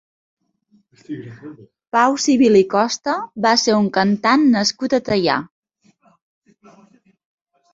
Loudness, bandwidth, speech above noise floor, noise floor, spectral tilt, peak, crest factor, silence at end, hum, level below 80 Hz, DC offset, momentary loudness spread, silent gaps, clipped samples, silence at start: -16 LUFS; 7.8 kHz; 43 dB; -60 dBFS; -4 dB/octave; -2 dBFS; 18 dB; 2.3 s; none; -58 dBFS; under 0.1%; 19 LU; none; under 0.1%; 1.1 s